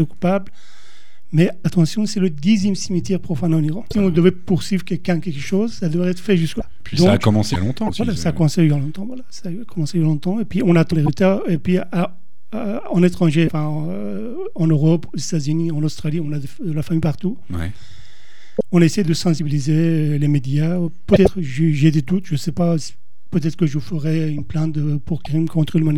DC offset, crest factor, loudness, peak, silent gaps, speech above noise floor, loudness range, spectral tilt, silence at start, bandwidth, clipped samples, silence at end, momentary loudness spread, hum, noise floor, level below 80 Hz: 5%; 18 dB; -19 LUFS; 0 dBFS; none; 34 dB; 4 LU; -7 dB/octave; 0 s; 12.5 kHz; under 0.1%; 0 s; 10 LU; none; -52 dBFS; -42 dBFS